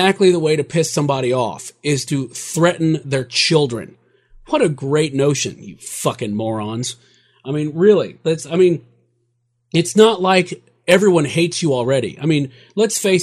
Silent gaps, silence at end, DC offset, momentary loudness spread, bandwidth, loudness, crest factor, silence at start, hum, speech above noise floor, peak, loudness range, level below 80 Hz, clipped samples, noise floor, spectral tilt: none; 0 s; under 0.1%; 12 LU; 15 kHz; -17 LUFS; 18 dB; 0 s; none; 50 dB; 0 dBFS; 5 LU; -58 dBFS; under 0.1%; -67 dBFS; -5 dB/octave